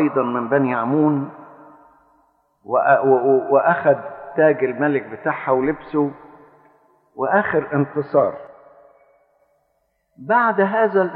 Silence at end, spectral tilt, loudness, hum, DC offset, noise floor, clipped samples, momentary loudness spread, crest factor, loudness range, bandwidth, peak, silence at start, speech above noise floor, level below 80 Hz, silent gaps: 0 s; -11.5 dB/octave; -19 LUFS; none; under 0.1%; -68 dBFS; under 0.1%; 9 LU; 18 dB; 5 LU; 4.4 kHz; -2 dBFS; 0 s; 50 dB; -62 dBFS; none